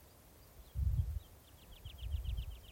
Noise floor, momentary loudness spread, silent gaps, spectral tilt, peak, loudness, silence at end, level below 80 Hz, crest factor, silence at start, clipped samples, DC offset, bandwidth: -61 dBFS; 22 LU; none; -6 dB/octave; -24 dBFS; -42 LUFS; 0 s; -44 dBFS; 18 dB; 0 s; under 0.1%; under 0.1%; 16.5 kHz